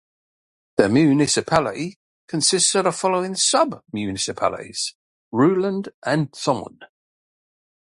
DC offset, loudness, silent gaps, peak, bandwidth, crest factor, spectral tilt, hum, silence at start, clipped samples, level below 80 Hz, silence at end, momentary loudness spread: under 0.1%; -20 LUFS; 1.96-2.28 s, 4.95-5.31 s, 5.94-6.02 s; 0 dBFS; 11.5 kHz; 22 dB; -3.5 dB/octave; none; 0.8 s; under 0.1%; -56 dBFS; 1 s; 12 LU